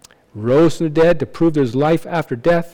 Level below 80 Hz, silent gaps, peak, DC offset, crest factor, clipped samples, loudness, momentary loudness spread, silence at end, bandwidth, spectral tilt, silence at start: -40 dBFS; none; -6 dBFS; under 0.1%; 10 dB; under 0.1%; -16 LUFS; 5 LU; 0.05 s; 17 kHz; -7.5 dB/octave; 0.35 s